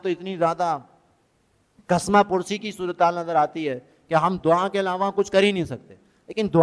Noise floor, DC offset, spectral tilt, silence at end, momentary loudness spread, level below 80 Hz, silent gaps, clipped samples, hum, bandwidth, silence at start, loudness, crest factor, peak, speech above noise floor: -65 dBFS; under 0.1%; -5.5 dB/octave; 0 s; 11 LU; -58 dBFS; none; under 0.1%; none; 11 kHz; 0.05 s; -23 LUFS; 18 dB; -4 dBFS; 43 dB